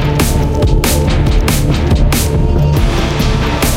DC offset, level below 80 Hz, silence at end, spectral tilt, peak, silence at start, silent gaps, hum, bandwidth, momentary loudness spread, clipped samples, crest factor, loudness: under 0.1%; -14 dBFS; 0 s; -5.5 dB/octave; 0 dBFS; 0 s; none; none; 17 kHz; 2 LU; under 0.1%; 10 dB; -13 LUFS